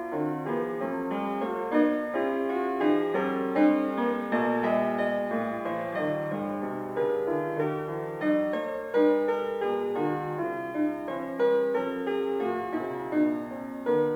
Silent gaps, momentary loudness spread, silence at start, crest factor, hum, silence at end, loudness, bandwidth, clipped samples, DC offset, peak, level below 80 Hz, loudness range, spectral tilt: none; 7 LU; 0 s; 16 dB; none; 0 s; -28 LUFS; 17 kHz; under 0.1%; under 0.1%; -10 dBFS; -66 dBFS; 3 LU; -7.5 dB/octave